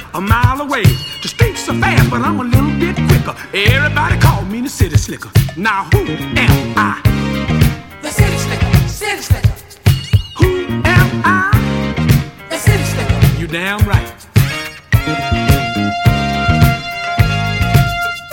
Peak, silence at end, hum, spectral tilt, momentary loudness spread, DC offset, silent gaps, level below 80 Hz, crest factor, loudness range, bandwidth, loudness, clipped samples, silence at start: 0 dBFS; 0 s; none; -5.5 dB/octave; 6 LU; under 0.1%; none; -24 dBFS; 14 dB; 2 LU; 18 kHz; -14 LUFS; 0.3%; 0 s